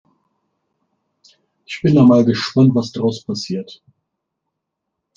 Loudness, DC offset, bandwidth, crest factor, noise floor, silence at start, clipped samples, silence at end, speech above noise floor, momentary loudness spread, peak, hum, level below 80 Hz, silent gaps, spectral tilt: -16 LUFS; under 0.1%; 7.4 kHz; 16 dB; -78 dBFS; 1.7 s; under 0.1%; 1.45 s; 63 dB; 16 LU; -2 dBFS; none; -58 dBFS; none; -7 dB/octave